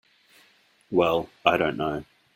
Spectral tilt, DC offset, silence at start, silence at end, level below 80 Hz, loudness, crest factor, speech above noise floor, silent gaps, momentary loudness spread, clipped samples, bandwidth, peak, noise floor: -6 dB/octave; under 0.1%; 0.9 s; 0.35 s; -58 dBFS; -25 LUFS; 24 dB; 37 dB; none; 8 LU; under 0.1%; 16.5 kHz; -2 dBFS; -61 dBFS